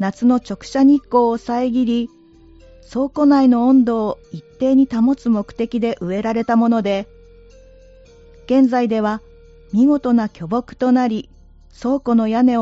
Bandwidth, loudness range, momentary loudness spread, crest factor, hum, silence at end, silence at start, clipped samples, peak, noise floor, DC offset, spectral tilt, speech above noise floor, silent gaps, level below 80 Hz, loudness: 7.8 kHz; 4 LU; 11 LU; 14 dB; none; 0 s; 0 s; under 0.1%; -4 dBFS; -46 dBFS; under 0.1%; -6 dB/octave; 30 dB; none; -48 dBFS; -17 LUFS